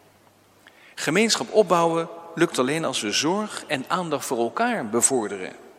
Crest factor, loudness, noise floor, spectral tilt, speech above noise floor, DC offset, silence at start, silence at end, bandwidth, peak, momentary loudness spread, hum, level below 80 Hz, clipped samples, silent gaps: 20 dB; -23 LUFS; -56 dBFS; -3 dB/octave; 33 dB; under 0.1%; 0.95 s; 0.1 s; 16.5 kHz; -4 dBFS; 9 LU; none; -72 dBFS; under 0.1%; none